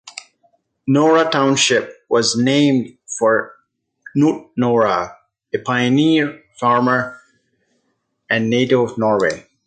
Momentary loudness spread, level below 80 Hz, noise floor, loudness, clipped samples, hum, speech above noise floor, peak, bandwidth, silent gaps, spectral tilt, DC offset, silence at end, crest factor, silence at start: 12 LU; -60 dBFS; -69 dBFS; -17 LUFS; under 0.1%; none; 53 dB; -2 dBFS; 9.2 kHz; none; -4.5 dB/octave; under 0.1%; 0.25 s; 16 dB; 0.05 s